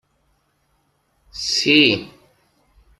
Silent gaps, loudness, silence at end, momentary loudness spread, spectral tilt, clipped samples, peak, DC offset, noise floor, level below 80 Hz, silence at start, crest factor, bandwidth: none; -16 LUFS; 0.9 s; 15 LU; -3 dB/octave; under 0.1%; -2 dBFS; under 0.1%; -65 dBFS; -56 dBFS; 1.35 s; 22 dB; 12.5 kHz